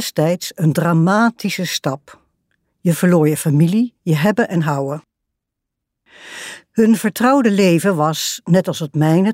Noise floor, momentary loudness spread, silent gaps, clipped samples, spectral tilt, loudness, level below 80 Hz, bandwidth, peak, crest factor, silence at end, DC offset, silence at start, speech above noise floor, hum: -79 dBFS; 11 LU; none; under 0.1%; -6 dB/octave; -16 LUFS; -62 dBFS; 16 kHz; -2 dBFS; 14 dB; 0 s; under 0.1%; 0 s; 64 dB; none